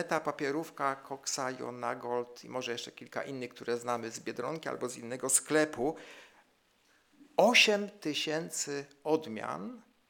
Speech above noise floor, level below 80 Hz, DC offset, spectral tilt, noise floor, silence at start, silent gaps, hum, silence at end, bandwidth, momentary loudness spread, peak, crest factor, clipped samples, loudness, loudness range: 36 dB; -78 dBFS; under 0.1%; -2 dB/octave; -70 dBFS; 0 s; none; none; 0.3 s; 19 kHz; 14 LU; -10 dBFS; 24 dB; under 0.1%; -32 LUFS; 8 LU